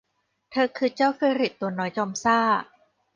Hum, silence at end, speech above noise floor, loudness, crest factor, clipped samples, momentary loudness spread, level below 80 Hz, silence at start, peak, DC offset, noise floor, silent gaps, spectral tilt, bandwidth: none; 0.5 s; 37 dB; -24 LUFS; 18 dB; under 0.1%; 6 LU; -70 dBFS; 0.5 s; -8 dBFS; under 0.1%; -61 dBFS; none; -4.5 dB/octave; 9.8 kHz